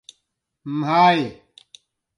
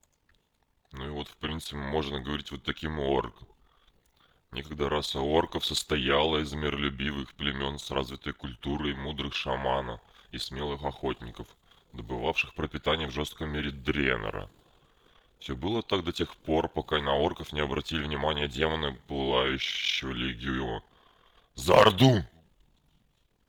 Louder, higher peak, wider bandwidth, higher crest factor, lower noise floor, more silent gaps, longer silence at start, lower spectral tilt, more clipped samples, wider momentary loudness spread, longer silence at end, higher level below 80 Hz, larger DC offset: first, -19 LUFS vs -30 LUFS; about the same, -4 dBFS vs -6 dBFS; second, 11 kHz vs over 20 kHz; second, 20 dB vs 26 dB; about the same, -75 dBFS vs -72 dBFS; neither; second, 0.65 s vs 0.95 s; about the same, -6 dB/octave vs -5 dB/octave; neither; about the same, 16 LU vs 14 LU; second, 0.85 s vs 1.2 s; second, -66 dBFS vs -46 dBFS; neither